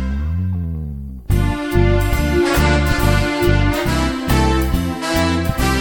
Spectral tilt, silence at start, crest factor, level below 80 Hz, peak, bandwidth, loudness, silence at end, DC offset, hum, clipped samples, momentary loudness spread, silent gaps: -6 dB/octave; 0 s; 14 dB; -22 dBFS; -2 dBFS; 17.5 kHz; -17 LUFS; 0 s; 0.3%; none; under 0.1%; 7 LU; none